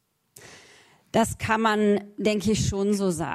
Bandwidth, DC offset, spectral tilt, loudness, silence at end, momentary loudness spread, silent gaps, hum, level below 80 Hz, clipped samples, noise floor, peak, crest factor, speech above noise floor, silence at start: 14.5 kHz; under 0.1%; -5 dB/octave; -24 LUFS; 0 s; 4 LU; none; none; -50 dBFS; under 0.1%; -55 dBFS; -8 dBFS; 18 dB; 32 dB; 0.4 s